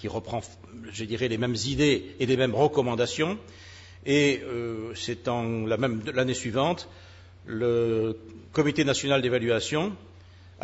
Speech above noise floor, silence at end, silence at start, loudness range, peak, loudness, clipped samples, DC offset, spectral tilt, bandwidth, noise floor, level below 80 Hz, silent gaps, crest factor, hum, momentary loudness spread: 23 dB; 0 s; 0 s; 3 LU; -10 dBFS; -27 LUFS; under 0.1%; under 0.1%; -5 dB/octave; 8 kHz; -50 dBFS; -56 dBFS; none; 18 dB; none; 14 LU